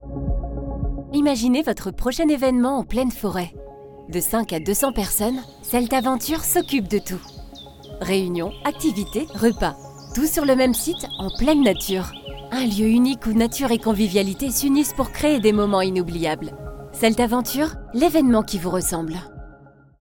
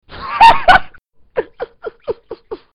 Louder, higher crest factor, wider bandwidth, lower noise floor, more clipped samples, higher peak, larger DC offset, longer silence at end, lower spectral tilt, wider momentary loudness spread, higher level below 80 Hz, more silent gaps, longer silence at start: second, -21 LUFS vs -11 LUFS; about the same, 18 dB vs 14 dB; first, 18 kHz vs 13 kHz; first, -48 dBFS vs -43 dBFS; neither; second, -4 dBFS vs 0 dBFS; neither; first, 0.6 s vs 0.2 s; about the same, -4.5 dB/octave vs -3.5 dB/octave; second, 14 LU vs 21 LU; about the same, -36 dBFS vs -34 dBFS; neither; about the same, 0 s vs 0.1 s